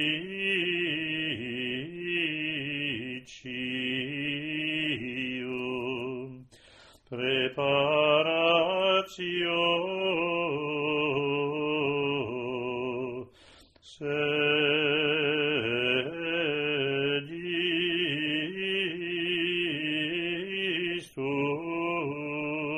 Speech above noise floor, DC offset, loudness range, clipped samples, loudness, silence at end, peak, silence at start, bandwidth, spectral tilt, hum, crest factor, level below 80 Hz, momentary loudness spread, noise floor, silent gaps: 28 dB; under 0.1%; 6 LU; under 0.1%; -28 LUFS; 0 s; -12 dBFS; 0 s; 10.5 kHz; -5.5 dB/octave; none; 18 dB; -66 dBFS; 9 LU; -56 dBFS; none